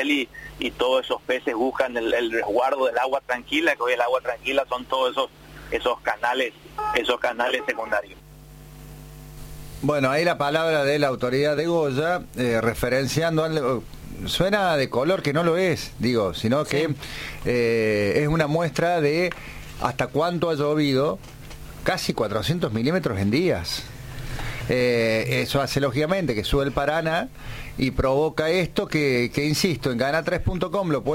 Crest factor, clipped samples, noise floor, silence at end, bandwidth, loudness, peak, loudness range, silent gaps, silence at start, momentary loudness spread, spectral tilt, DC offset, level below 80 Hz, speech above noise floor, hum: 16 dB; under 0.1%; -44 dBFS; 0 s; 16.5 kHz; -23 LUFS; -6 dBFS; 3 LU; none; 0 s; 10 LU; -5.5 dB/octave; under 0.1%; -42 dBFS; 21 dB; none